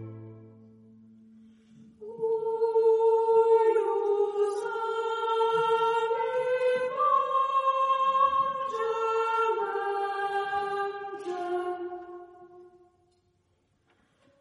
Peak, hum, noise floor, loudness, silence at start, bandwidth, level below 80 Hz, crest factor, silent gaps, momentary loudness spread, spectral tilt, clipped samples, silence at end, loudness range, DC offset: -12 dBFS; none; -71 dBFS; -27 LUFS; 0 s; 11.5 kHz; -76 dBFS; 16 dB; none; 12 LU; -4.5 dB/octave; under 0.1%; 1.75 s; 9 LU; under 0.1%